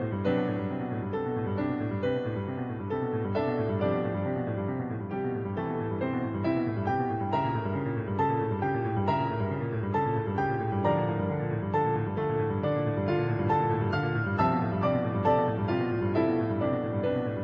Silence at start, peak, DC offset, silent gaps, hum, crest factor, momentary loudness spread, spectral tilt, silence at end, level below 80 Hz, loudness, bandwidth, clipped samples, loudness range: 0 s; -12 dBFS; under 0.1%; none; none; 16 dB; 5 LU; -10 dB/octave; 0 s; -56 dBFS; -29 LUFS; 5.4 kHz; under 0.1%; 4 LU